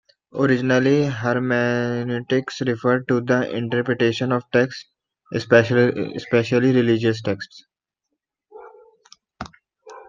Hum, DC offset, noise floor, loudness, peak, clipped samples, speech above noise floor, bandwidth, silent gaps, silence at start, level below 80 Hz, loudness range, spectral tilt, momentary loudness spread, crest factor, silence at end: none; under 0.1%; -80 dBFS; -20 LUFS; -2 dBFS; under 0.1%; 61 dB; 7.4 kHz; none; 0.35 s; -60 dBFS; 3 LU; -6.5 dB/octave; 13 LU; 20 dB; 0.05 s